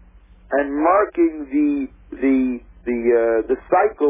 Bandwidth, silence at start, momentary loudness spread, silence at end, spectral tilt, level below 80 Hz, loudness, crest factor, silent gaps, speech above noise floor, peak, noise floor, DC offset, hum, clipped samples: 3.7 kHz; 0.5 s; 9 LU; 0 s; -10.5 dB/octave; -46 dBFS; -19 LUFS; 14 dB; none; 29 dB; -4 dBFS; -47 dBFS; under 0.1%; none; under 0.1%